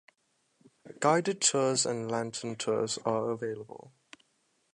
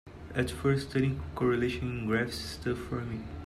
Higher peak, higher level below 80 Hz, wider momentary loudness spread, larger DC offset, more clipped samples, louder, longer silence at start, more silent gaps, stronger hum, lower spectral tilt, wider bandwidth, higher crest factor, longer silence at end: first, -12 dBFS vs -16 dBFS; second, -76 dBFS vs -48 dBFS; first, 12 LU vs 7 LU; neither; neither; about the same, -30 LUFS vs -32 LUFS; first, 0.85 s vs 0.05 s; neither; neither; second, -3 dB/octave vs -6.5 dB/octave; second, 11.5 kHz vs 13.5 kHz; first, 22 dB vs 16 dB; first, 0.85 s vs 0 s